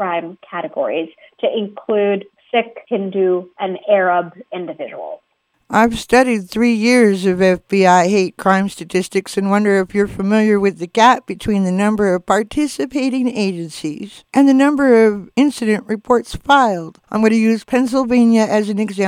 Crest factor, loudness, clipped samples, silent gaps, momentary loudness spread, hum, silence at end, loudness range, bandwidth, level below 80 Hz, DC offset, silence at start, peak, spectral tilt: 16 dB; -16 LUFS; under 0.1%; none; 13 LU; none; 0 s; 5 LU; 15 kHz; -48 dBFS; under 0.1%; 0 s; 0 dBFS; -5.5 dB/octave